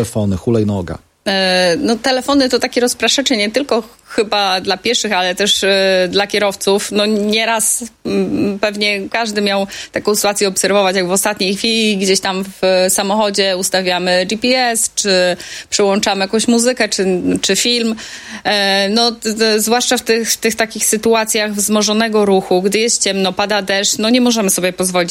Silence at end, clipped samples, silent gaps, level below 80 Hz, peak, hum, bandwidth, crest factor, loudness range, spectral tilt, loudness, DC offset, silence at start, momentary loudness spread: 0 s; under 0.1%; none; -48 dBFS; 0 dBFS; none; 17 kHz; 14 dB; 2 LU; -3 dB/octave; -14 LUFS; under 0.1%; 0 s; 5 LU